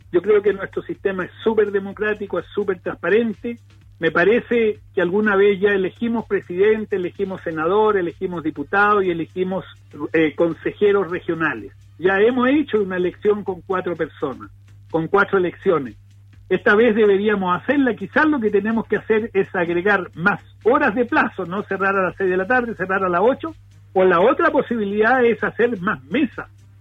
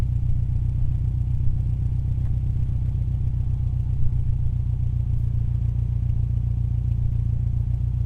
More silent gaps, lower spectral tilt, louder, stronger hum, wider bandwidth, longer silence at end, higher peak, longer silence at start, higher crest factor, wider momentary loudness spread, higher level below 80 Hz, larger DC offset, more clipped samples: neither; second, -8 dB/octave vs -10.5 dB/octave; first, -19 LUFS vs -25 LUFS; neither; first, 5.8 kHz vs 2.9 kHz; first, 0.35 s vs 0 s; first, -4 dBFS vs -8 dBFS; first, 0.15 s vs 0 s; about the same, 16 dB vs 14 dB; first, 10 LU vs 1 LU; second, -52 dBFS vs -26 dBFS; neither; neither